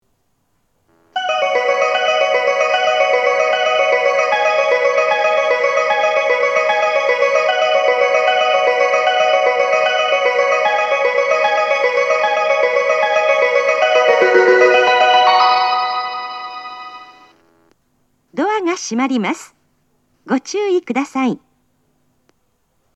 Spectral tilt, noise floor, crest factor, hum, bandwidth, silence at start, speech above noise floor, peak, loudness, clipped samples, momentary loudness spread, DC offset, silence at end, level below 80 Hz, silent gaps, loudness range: -2.5 dB/octave; -65 dBFS; 14 dB; none; 8.4 kHz; 1.15 s; 47 dB; 0 dBFS; -14 LUFS; under 0.1%; 10 LU; under 0.1%; 1.6 s; -72 dBFS; none; 10 LU